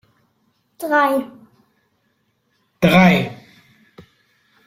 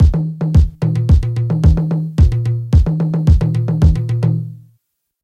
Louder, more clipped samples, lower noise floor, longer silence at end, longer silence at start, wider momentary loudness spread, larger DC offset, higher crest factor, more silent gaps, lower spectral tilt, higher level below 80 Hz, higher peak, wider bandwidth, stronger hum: about the same, -16 LUFS vs -15 LUFS; neither; about the same, -66 dBFS vs -64 dBFS; first, 1.3 s vs 0.7 s; first, 0.8 s vs 0 s; first, 18 LU vs 5 LU; neither; first, 20 dB vs 14 dB; neither; second, -6.5 dB/octave vs -9.5 dB/octave; second, -52 dBFS vs -18 dBFS; about the same, -2 dBFS vs 0 dBFS; first, 15.5 kHz vs 6.8 kHz; neither